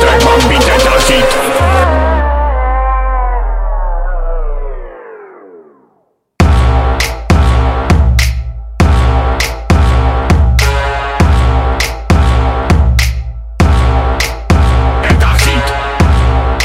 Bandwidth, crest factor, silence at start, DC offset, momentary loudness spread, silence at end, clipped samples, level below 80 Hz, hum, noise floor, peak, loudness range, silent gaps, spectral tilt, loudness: 15.5 kHz; 10 dB; 0 s; under 0.1%; 11 LU; 0 s; under 0.1%; -12 dBFS; none; -57 dBFS; 0 dBFS; 6 LU; none; -5.5 dB/octave; -11 LUFS